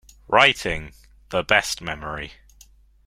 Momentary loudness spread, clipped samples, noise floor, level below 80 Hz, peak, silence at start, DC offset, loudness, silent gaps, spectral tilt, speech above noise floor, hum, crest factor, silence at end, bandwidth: 16 LU; under 0.1%; -52 dBFS; -46 dBFS; 0 dBFS; 0.3 s; under 0.1%; -21 LUFS; none; -2.5 dB/octave; 31 dB; none; 24 dB; 0.75 s; 16.5 kHz